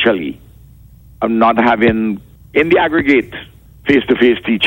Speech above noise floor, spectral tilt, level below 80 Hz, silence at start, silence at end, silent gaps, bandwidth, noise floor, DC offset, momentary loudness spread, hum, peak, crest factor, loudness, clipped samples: 28 dB; -7 dB/octave; -42 dBFS; 0 s; 0 s; none; 16.5 kHz; -41 dBFS; under 0.1%; 14 LU; none; 0 dBFS; 14 dB; -13 LUFS; under 0.1%